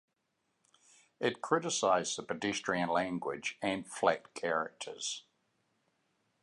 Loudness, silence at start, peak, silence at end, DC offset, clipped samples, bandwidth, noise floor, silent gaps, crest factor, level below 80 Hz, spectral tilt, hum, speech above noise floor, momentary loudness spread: -34 LUFS; 1.2 s; -14 dBFS; 1.2 s; under 0.1%; under 0.1%; 11 kHz; -81 dBFS; none; 22 dB; -74 dBFS; -3 dB/octave; none; 47 dB; 8 LU